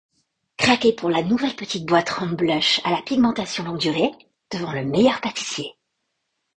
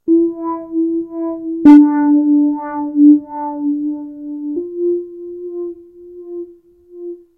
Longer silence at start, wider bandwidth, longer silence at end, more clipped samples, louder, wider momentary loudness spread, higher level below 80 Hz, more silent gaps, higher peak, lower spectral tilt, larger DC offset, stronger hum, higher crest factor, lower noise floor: first, 0.6 s vs 0.05 s; first, 9.6 kHz vs 3.4 kHz; first, 0.85 s vs 0.2 s; second, under 0.1% vs 0.4%; second, -21 LUFS vs -14 LUFS; second, 10 LU vs 22 LU; about the same, -58 dBFS vs -56 dBFS; neither; about the same, -2 dBFS vs 0 dBFS; second, -4.5 dB/octave vs -8.5 dB/octave; neither; neither; first, 20 dB vs 14 dB; first, -76 dBFS vs -43 dBFS